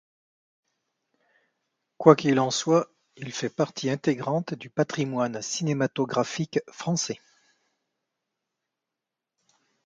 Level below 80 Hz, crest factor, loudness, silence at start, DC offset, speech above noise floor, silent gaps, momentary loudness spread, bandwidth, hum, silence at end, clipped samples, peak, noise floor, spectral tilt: -72 dBFS; 28 dB; -26 LUFS; 2 s; under 0.1%; 62 dB; none; 12 LU; 9.4 kHz; none; 2.7 s; under 0.1%; 0 dBFS; -87 dBFS; -5 dB/octave